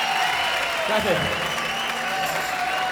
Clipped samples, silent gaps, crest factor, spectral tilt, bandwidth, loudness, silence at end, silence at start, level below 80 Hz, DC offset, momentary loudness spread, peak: under 0.1%; none; 16 dB; -2.5 dB/octave; over 20 kHz; -23 LUFS; 0 s; 0 s; -52 dBFS; under 0.1%; 3 LU; -6 dBFS